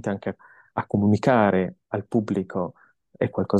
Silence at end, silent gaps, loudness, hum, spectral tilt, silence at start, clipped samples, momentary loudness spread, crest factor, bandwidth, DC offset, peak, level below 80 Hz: 0 s; none; -24 LUFS; none; -8.5 dB/octave; 0.05 s; under 0.1%; 14 LU; 18 dB; 8.8 kHz; under 0.1%; -6 dBFS; -62 dBFS